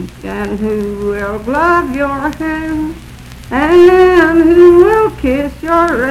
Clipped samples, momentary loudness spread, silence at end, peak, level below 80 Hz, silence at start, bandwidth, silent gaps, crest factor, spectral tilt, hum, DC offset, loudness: 2%; 14 LU; 0 s; 0 dBFS; -32 dBFS; 0 s; 13 kHz; none; 10 dB; -6.5 dB/octave; none; under 0.1%; -11 LUFS